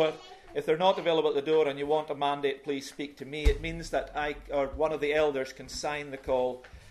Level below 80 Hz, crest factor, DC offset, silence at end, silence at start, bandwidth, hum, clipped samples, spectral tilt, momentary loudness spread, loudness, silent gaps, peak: -42 dBFS; 18 dB; under 0.1%; 0 s; 0 s; 13.5 kHz; none; under 0.1%; -5 dB/octave; 10 LU; -30 LUFS; none; -10 dBFS